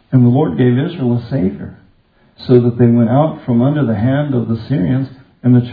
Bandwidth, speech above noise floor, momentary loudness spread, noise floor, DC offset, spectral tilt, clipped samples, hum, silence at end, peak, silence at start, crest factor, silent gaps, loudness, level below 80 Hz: 4.9 kHz; 39 dB; 9 LU; -52 dBFS; under 0.1%; -12 dB/octave; under 0.1%; none; 0 s; 0 dBFS; 0.1 s; 14 dB; none; -14 LUFS; -48 dBFS